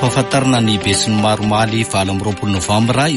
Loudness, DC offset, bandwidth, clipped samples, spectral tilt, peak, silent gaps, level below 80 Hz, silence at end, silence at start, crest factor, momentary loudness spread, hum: -15 LUFS; under 0.1%; 11.5 kHz; under 0.1%; -4.5 dB/octave; -2 dBFS; none; -40 dBFS; 0 s; 0 s; 12 dB; 5 LU; none